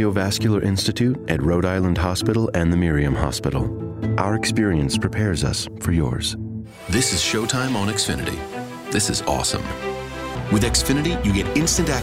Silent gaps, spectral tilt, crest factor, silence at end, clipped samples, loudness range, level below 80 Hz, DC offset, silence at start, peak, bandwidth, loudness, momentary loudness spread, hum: none; -4.5 dB/octave; 18 dB; 0 s; under 0.1%; 2 LU; -34 dBFS; under 0.1%; 0 s; -2 dBFS; 16 kHz; -21 LUFS; 9 LU; none